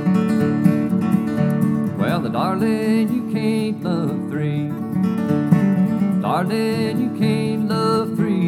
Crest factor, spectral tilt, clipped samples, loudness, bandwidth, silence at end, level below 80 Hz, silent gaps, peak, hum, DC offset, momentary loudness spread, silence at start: 16 dB; -8 dB/octave; under 0.1%; -19 LUFS; 15 kHz; 0 s; -60 dBFS; none; -2 dBFS; none; under 0.1%; 5 LU; 0 s